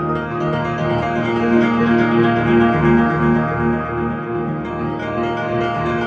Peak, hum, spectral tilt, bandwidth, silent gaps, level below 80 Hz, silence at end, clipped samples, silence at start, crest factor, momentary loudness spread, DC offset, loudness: -2 dBFS; none; -8.5 dB/octave; 7 kHz; none; -38 dBFS; 0 s; under 0.1%; 0 s; 16 dB; 8 LU; under 0.1%; -17 LUFS